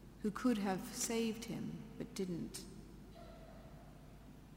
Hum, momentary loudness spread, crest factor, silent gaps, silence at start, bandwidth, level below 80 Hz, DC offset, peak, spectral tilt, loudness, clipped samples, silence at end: none; 21 LU; 20 dB; none; 0 s; 16 kHz; -62 dBFS; under 0.1%; -24 dBFS; -4.5 dB/octave; -41 LUFS; under 0.1%; 0 s